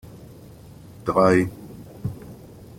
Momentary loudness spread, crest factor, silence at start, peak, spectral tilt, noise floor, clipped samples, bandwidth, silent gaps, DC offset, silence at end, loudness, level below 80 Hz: 27 LU; 22 dB; 0.05 s; -4 dBFS; -7 dB/octave; -44 dBFS; under 0.1%; 16.5 kHz; none; under 0.1%; 0.15 s; -22 LUFS; -52 dBFS